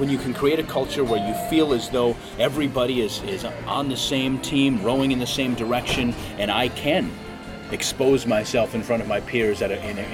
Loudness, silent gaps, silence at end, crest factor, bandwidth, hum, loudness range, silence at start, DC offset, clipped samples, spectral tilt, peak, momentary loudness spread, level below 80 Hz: -23 LUFS; none; 0 s; 16 dB; 16.5 kHz; none; 1 LU; 0 s; under 0.1%; under 0.1%; -4.5 dB/octave; -6 dBFS; 6 LU; -44 dBFS